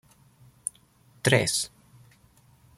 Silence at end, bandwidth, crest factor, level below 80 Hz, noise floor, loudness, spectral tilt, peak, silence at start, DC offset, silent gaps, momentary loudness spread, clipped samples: 1.1 s; 15.5 kHz; 26 dB; -62 dBFS; -59 dBFS; -27 LUFS; -3.5 dB/octave; -4 dBFS; 1.25 s; under 0.1%; none; 14 LU; under 0.1%